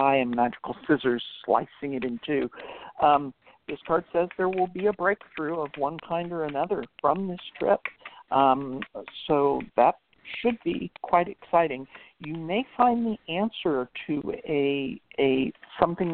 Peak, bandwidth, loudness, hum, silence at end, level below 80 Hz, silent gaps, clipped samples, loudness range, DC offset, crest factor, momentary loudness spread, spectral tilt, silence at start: -4 dBFS; 4.4 kHz; -27 LUFS; none; 0 s; -60 dBFS; none; under 0.1%; 2 LU; under 0.1%; 22 dB; 14 LU; -10 dB/octave; 0 s